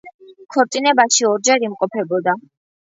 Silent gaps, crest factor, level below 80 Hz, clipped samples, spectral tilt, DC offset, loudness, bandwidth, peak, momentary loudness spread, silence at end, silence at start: 0.14-0.19 s; 18 dB; -74 dBFS; under 0.1%; -2 dB/octave; under 0.1%; -17 LUFS; 8 kHz; 0 dBFS; 9 LU; 0.55 s; 0.05 s